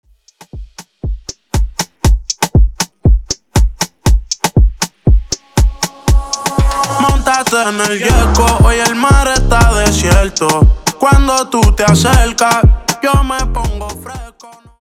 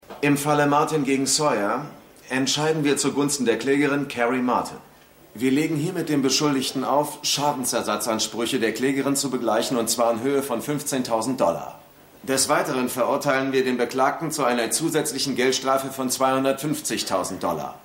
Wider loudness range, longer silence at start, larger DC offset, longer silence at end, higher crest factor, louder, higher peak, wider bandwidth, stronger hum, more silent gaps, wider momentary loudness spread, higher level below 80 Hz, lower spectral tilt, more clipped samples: first, 5 LU vs 1 LU; first, 0.55 s vs 0.1 s; neither; first, 0.5 s vs 0.05 s; about the same, 12 dB vs 16 dB; first, -12 LUFS vs -22 LUFS; first, 0 dBFS vs -8 dBFS; about the same, 16 kHz vs 16.5 kHz; neither; neither; first, 10 LU vs 6 LU; first, -14 dBFS vs -62 dBFS; about the same, -4.5 dB/octave vs -3.5 dB/octave; neither